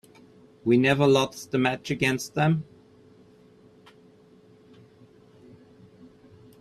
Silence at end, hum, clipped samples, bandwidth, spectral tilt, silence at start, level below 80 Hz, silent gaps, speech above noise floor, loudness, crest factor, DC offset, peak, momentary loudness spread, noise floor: 4 s; none; under 0.1%; 13.5 kHz; -5.5 dB/octave; 0.65 s; -62 dBFS; none; 32 dB; -24 LUFS; 20 dB; under 0.1%; -8 dBFS; 9 LU; -55 dBFS